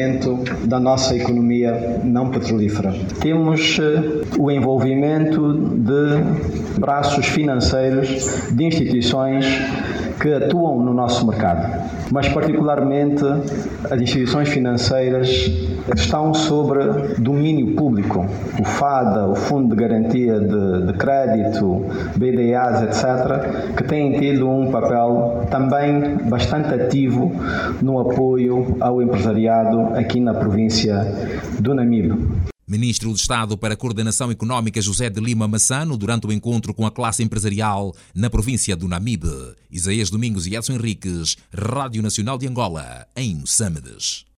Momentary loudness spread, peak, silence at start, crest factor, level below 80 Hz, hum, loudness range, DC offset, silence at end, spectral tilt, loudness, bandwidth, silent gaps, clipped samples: 6 LU; -4 dBFS; 0 s; 14 dB; -38 dBFS; none; 4 LU; under 0.1%; 0.2 s; -5.5 dB/octave; -19 LUFS; 14 kHz; none; under 0.1%